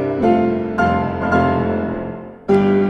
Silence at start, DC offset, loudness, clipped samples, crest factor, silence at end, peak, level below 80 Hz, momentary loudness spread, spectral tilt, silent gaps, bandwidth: 0 s; under 0.1%; -17 LUFS; under 0.1%; 14 dB; 0 s; -2 dBFS; -44 dBFS; 10 LU; -8.5 dB/octave; none; 6.8 kHz